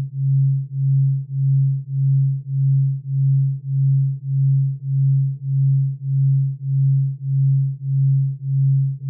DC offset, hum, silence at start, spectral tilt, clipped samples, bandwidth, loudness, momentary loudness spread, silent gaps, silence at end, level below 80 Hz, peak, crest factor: under 0.1%; none; 0 s; -28 dB/octave; under 0.1%; 0.4 kHz; -19 LUFS; 4 LU; none; 0 s; -66 dBFS; -12 dBFS; 6 dB